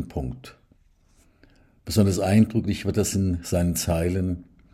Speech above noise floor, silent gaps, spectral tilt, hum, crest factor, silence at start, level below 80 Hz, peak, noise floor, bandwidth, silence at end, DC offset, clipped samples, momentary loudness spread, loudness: 36 dB; none; -6 dB/octave; none; 18 dB; 0 s; -46 dBFS; -6 dBFS; -59 dBFS; 16 kHz; 0.3 s; under 0.1%; under 0.1%; 15 LU; -24 LUFS